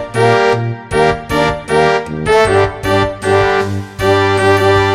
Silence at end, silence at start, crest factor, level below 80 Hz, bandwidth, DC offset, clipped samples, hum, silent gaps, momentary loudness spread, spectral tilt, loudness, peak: 0 s; 0 s; 12 dB; -34 dBFS; 13 kHz; under 0.1%; 0.2%; none; none; 6 LU; -5.5 dB/octave; -13 LUFS; 0 dBFS